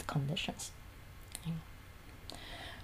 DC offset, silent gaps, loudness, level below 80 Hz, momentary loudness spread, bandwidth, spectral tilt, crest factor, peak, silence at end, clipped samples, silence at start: under 0.1%; none; -42 LUFS; -56 dBFS; 18 LU; 15.5 kHz; -4.5 dB/octave; 22 dB; -20 dBFS; 0 s; under 0.1%; 0 s